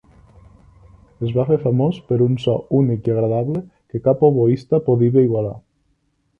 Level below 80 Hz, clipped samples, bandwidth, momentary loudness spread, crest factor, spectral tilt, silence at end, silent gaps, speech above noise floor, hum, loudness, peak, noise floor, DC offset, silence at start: -52 dBFS; under 0.1%; 5.8 kHz; 11 LU; 16 dB; -10.5 dB/octave; 0.8 s; none; 48 dB; none; -18 LUFS; -2 dBFS; -65 dBFS; under 0.1%; 1.2 s